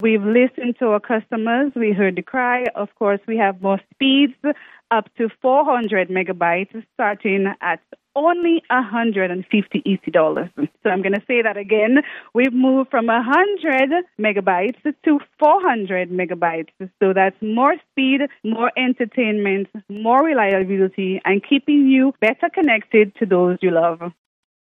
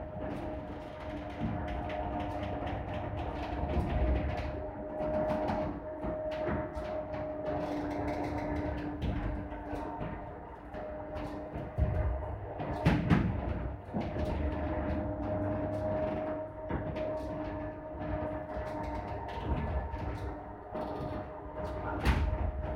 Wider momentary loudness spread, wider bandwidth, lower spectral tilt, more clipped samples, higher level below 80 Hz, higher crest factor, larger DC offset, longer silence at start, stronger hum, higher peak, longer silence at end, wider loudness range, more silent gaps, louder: about the same, 7 LU vs 9 LU; second, 3.9 kHz vs 11.5 kHz; about the same, -8 dB/octave vs -8.5 dB/octave; neither; second, -70 dBFS vs -40 dBFS; second, 16 dB vs 22 dB; neither; about the same, 0 s vs 0 s; neither; first, -2 dBFS vs -12 dBFS; first, 0.55 s vs 0 s; about the same, 3 LU vs 5 LU; neither; first, -18 LUFS vs -36 LUFS